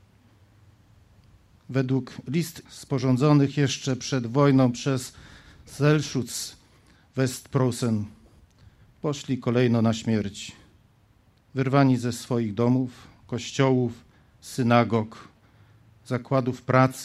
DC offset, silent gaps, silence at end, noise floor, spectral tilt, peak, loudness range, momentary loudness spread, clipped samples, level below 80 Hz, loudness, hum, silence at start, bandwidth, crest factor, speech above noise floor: under 0.1%; none; 0 s; -60 dBFS; -6.5 dB/octave; -4 dBFS; 4 LU; 14 LU; under 0.1%; -60 dBFS; -25 LUFS; none; 1.7 s; 13.5 kHz; 22 dB; 36 dB